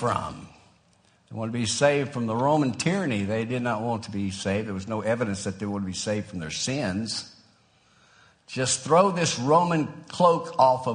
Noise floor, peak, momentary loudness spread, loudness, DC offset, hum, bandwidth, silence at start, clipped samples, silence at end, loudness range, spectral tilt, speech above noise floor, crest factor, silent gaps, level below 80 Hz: -62 dBFS; -6 dBFS; 11 LU; -25 LUFS; under 0.1%; none; 10 kHz; 0 s; under 0.1%; 0 s; 6 LU; -4.5 dB/octave; 37 dB; 20 dB; none; -60 dBFS